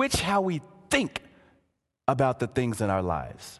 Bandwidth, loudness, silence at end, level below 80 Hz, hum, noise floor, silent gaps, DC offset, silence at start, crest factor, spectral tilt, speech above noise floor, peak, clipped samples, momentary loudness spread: 13 kHz; -27 LUFS; 0.05 s; -48 dBFS; none; -73 dBFS; none; under 0.1%; 0 s; 20 dB; -5 dB/octave; 46 dB; -8 dBFS; under 0.1%; 8 LU